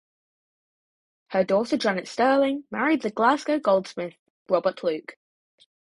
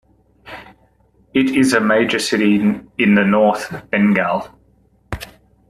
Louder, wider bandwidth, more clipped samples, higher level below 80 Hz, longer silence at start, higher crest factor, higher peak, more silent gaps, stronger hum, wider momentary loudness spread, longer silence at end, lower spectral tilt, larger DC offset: second, -24 LUFS vs -16 LUFS; second, 11.5 kHz vs 13 kHz; neither; second, -70 dBFS vs -48 dBFS; first, 1.3 s vs 0.45 s; about the same, 20 dB vs 16 dB; second, -6 dBFS vs -2 dBFS; first, 4.19-4.46 s vs none; neither; second, 13 LU vs 22 LU; first, 0.85 s vs 0.45 s; about the same, -5.5 dB/octave vs -5.5 dB/octave; neither